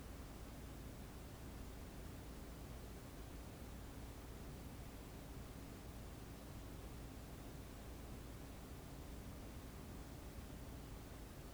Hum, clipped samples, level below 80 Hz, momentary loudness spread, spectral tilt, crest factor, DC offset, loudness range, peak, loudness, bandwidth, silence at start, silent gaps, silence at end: none; under 0.1%; -56 dBFS; 1 LU; -5.5 dB/octave; 12 dB; under 0.1%; 0 LU; -40 dBFS; -54 LUFS; over 20 kHz; 0 s; none; 0 s